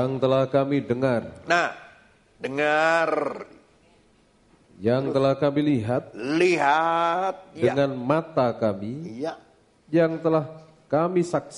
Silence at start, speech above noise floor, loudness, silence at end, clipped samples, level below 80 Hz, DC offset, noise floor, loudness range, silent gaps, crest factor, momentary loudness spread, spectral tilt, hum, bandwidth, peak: 0 s; 37 dB; -24 LUFS; 0 s; under 0.1%; -62 dBFS; under 0.1%; -60 dBFS; 3 LU; none; 20 dB; 12 LU; -6.5 dB/octave; none; 10.5 kHz; -4 dBFS